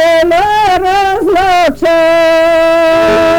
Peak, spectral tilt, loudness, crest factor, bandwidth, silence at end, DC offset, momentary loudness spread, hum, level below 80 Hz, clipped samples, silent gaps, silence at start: -6 dBFS; -4 dB/octave; -8 LUFS; 2 dB; 19 kHz; 0 s; under 0.1%; 2 LU; none; -34 dBFS; under 0.1%; none; 0 s